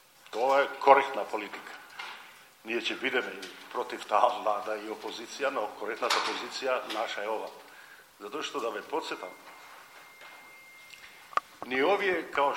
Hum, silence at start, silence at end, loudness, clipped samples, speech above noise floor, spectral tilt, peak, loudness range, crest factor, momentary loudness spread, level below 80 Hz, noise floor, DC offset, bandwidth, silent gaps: none; 0.3 s; 0 s; -30 LUFS; under 0.1%; 23 dB; -2 dB/octave; -4 dBFS; 10 LU; 28 dB; 22 LU; -80 dBFS; -53 dBFS; under 0.1%; 16.5 kHz; none